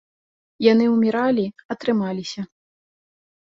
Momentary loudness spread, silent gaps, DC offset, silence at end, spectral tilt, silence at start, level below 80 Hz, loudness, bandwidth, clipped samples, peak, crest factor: 14 LU; 1.65-1.69 s; under 0.1%; 0.95 s; -6.5 dB/octave; 0.6 s; -66 dBFS; -20 LUFS; 7.6 kHz; under 0.1%; -2 dBFS; 20 dB